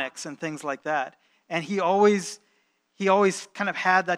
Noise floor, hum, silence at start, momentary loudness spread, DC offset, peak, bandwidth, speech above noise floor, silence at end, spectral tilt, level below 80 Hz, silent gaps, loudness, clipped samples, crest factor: -69 dBFS; none; 0 s; 13 LU; under 0.1%; -6 dBFS; 12.5 kHz; 44 dB; 0 s; -4.5 dB/octave; -86 dBFS; none; -25 LUFS; under 0.1%; 20 dB